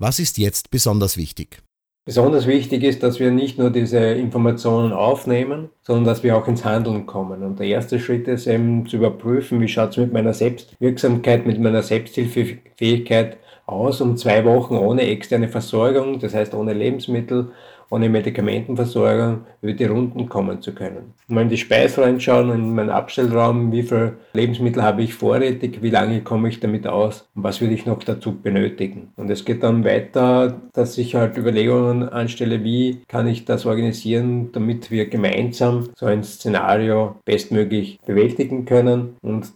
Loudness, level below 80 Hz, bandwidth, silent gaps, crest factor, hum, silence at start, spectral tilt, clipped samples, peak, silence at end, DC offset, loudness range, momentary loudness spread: -19 LUFS; -54 dBFS; over 20 kHz; none; 16 dB; none; 0 s; -6.5 dB/octave; under 0.1%; -2 dBFS; 0.05 s; under 0.1%; 3 LU; 7 LU